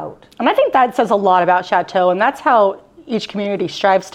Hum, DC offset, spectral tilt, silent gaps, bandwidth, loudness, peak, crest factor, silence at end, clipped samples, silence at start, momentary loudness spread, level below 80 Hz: none; under 0.1%; -5 dB/octave; none; 13.5 kHz; -15 LUFS; -2 dBFS; 14 dB; 0.05 s; under 0.1%; 0 s; 9 LU; -60 dBFS